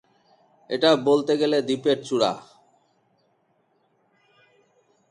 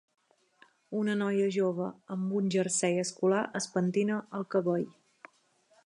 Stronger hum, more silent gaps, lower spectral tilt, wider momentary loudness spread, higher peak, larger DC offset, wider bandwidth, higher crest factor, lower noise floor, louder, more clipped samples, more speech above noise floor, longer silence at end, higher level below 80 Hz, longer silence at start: neither; neither; about the same, -5 dB/octave vs -5 dB/octave; about the same, 7 LU vs 8 LU; first, -4 dBFS vs -16 dBFS; neither; about the same, 10.5 kHz vs 11.5 kHz; first, 22 dB vs 16 dB; about the same, -67 dBFS vs -68 dBFS; first, -22 LUFS vs -31 LUFS; neither; first, 46 dB vs 38 dB; first, 2.7 s vs 0.95 s; first, -72 dBFS vs -80 dBFS; second, 0.7 s vs 0.9 s